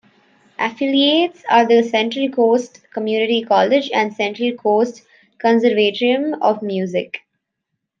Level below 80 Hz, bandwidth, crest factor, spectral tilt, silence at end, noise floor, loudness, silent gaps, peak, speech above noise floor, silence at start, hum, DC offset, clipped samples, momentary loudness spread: -72 dBFS; 7.4 kHz; 16 dB; -5 dB/octave; 0.8 s; -77 dBFS; -17 LUFS; none; -2 dBFS; 60 dB; 0.6 s; none; under 0.1%; under 0.1%; 9 LU